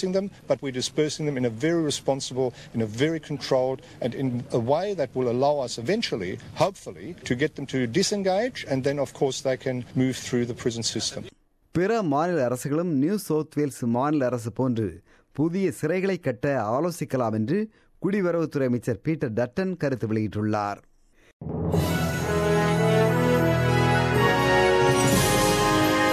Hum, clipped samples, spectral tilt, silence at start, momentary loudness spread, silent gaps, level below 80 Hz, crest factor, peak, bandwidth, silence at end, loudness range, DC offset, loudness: none; under 0.1%; -5.5 dB/octave; 0 s; 9 LU; 21.33-21.40 s; -46 dBFS; 18 dB; -8 dBFS; 14.5 kHz; 0 s; 6 LU; under 0.1%; -25 LUFS